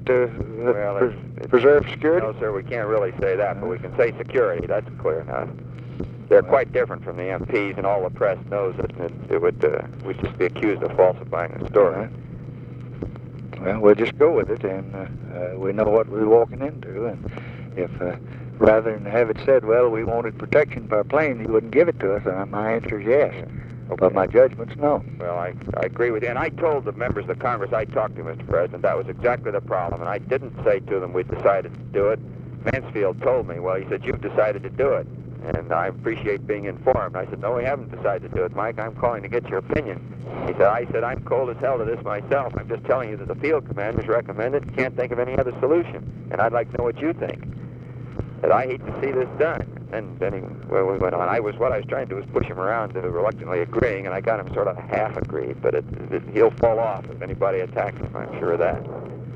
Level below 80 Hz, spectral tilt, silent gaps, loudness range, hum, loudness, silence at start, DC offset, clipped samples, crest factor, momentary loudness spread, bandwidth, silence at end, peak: -46 dBFS; -9 dB/octave; none; 4 LU; none; -23 LUFS; 0 s; under 0.1%; under 0.1%; 20 dB; 13 LU; 6 kHz; 0 s; -2 dBFS